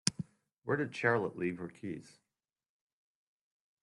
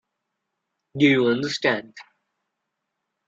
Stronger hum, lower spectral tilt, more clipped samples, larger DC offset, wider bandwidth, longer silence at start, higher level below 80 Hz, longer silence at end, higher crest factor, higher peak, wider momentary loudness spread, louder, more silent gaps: neither; second, -4 dB/octave vs -5.5 dB/octave; neither; neither; first, 11.5 kHz vs 7.8 kHz; second, 0.05 s vs 0.95 s; second, -74 dBFS vs -68 dBFS; first, 1.75 s vs 1.25 s; first, 32 dB vs 20 dB; about the same, -6 dBFS vs -6 dBFS; first, 16 LU vs 10 LU; second, -35 LUFS vs -21 LUFS; first, 0.58-0.62 s vs none